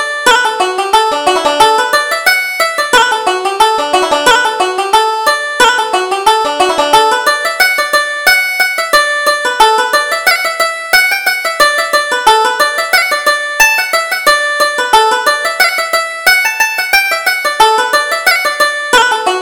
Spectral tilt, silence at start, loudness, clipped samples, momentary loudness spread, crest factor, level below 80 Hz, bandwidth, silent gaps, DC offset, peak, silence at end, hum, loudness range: 0 dB/octave; 0 s; -10 LUFS; 0.2%; 4 LU; 10 dB; -44 dBFS; over 20 kHz; none; under 0.1%; 0 dBFS; 0 s; none; 1 LU